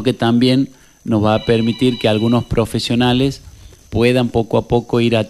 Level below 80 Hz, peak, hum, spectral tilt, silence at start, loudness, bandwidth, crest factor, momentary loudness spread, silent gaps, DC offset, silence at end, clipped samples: -38 dBFS; -2 dBFS; none; -6.5 dB/octave; 0 s; -16 LUFS; 13 kHz; 14 dB; 6 LU; none; under 0.1%; 0 s; under 0.1%